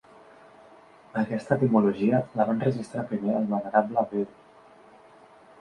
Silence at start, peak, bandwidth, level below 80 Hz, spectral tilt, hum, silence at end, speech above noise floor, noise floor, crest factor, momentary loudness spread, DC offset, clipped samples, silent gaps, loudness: 1.15 s; -8 dBFS; 10 kHz; -66 dBFS; -9 dB/octave; none; 1.35 s; 28 dB; -53 dBFS; 20 dB; 10 LU; under 0.1%; under 0.1%; none; -26 LUFS